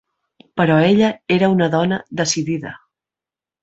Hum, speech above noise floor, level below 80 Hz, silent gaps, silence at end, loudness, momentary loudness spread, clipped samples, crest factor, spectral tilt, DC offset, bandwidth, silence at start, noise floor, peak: none; 73 dB; -56 dBFS; none; 0.85 s; -17 LUFS; 12 LU; under 0.1%; 16 dB; -5.5 dB/octave; under 0.1%; 8.2 kHz; 0.55 s; -89 dBFS; -2 dBFS